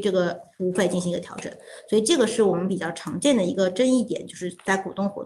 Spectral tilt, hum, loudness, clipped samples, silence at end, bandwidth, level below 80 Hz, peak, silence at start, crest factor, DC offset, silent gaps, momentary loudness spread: -4.5 dB/octave; none; -24 LUFS; under 0.1%; 0 s; 12.5 kHz; -64 dBFS; -8 dBFS; 0 s; 16 dB; under 0.1%; none; 11 LU